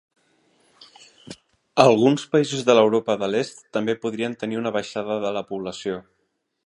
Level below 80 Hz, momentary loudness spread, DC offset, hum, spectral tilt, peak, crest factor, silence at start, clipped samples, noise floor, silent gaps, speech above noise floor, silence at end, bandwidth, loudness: -66 dBFS; 14 LU; under 0.1%; none; -5.5 dB/octave; 0 dBFS; 22 dB; 1.3 s; under 0.1%; -73 dBFS; none; 51 dB; 0.65 s; 11 kHz; -22 LUFS